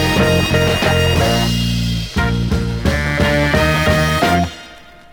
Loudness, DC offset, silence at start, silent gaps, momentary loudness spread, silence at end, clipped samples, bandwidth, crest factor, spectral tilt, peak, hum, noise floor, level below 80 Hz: -15 LUFS; under 0.1%; 0 s; none; 5 LU; 0.3 s; under 0.1%; over 20 kHz; 14 dB; -5 dB/octave; -2 dBFS; none; -39 dBFS; -26 dBFS